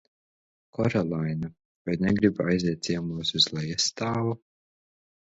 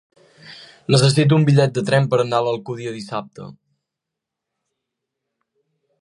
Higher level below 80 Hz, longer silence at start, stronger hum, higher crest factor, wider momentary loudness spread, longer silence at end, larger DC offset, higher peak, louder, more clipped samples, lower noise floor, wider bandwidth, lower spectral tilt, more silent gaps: first, -54 dBFS vs -60 dBFS; first, 0.8 s vs 0.45 s; neither; about the same, 20 dB vs 20 dB; second, 11 LU vs 16 LU; second, 0.9 s vs 2.5 s; neither; second, -8 dBFS vs -2 dBFS; second, -26 LUFS vs -18 LUFS; neither; first, under -90 dBFS vs -83 dBFS; second, 8 kHz vs 11 kHz; second, -4.5 dB/octave vs -6 dB/octave; first, 1.65-1.85 s vs none